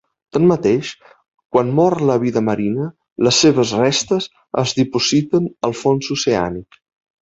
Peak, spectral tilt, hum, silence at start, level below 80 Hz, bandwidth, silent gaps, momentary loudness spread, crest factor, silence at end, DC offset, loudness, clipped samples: -2 dBFS; -5 dB/octave; none; 0.35 s; -52 dBFS; 8 kHz; 1.45-1.50 s, 3.12-3.16 s; 10 LU; 16 dB; 0.6 s; under 0.1%; -17 LUFS; under 0.1%